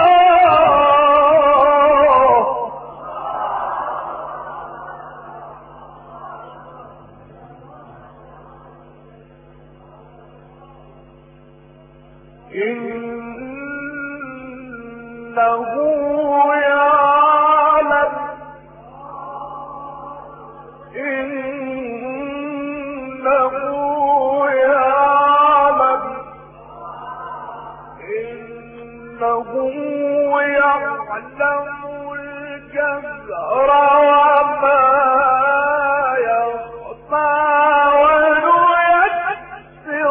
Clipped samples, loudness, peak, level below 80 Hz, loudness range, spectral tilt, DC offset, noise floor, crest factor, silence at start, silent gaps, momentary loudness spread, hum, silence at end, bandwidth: under 0.1%; -15 LUFS; -2 dBFS; -50 dBFS; 16 LU; -8 dB/octave; under 0.1%; -45 dBFS; 14 dB; 0 s; none; 22 LU; none; 0 s; 3.6 kHz